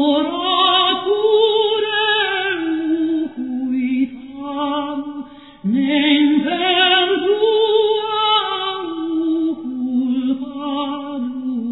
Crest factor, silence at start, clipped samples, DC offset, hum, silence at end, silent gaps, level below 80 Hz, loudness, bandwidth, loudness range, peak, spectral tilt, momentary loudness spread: 16 dB; 0 s; under 0.1%; 0.2%; none; 0 s; none; -64 dBFS; -17 LUFS; 4.1 kHz; 6 LU; -2 dBFS; -7 dB/octave; 11 LU